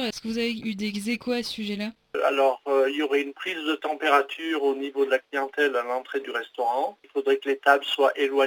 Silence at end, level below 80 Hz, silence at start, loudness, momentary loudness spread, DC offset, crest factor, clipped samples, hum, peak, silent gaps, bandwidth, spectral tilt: 0 s; -68 dBFS; 0 s; -25 LUFS; 8 LU; under 0.1%; 20 dB; under 0.1%; none; -6 dBFS; none; 19 kHz; -4 dB/octave